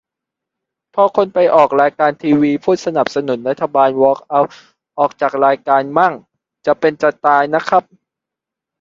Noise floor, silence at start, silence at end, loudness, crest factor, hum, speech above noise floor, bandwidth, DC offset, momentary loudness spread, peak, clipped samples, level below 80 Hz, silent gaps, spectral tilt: -84 dBFS; 0.95 s; 1 s; -15 LUFS; 16 dB; none; 70 dB; 7.6 kHz; under 0.1%; 7 LU; 0 dBFS; under 0.1%; -60 dBFS; none; -6.5 dB/octave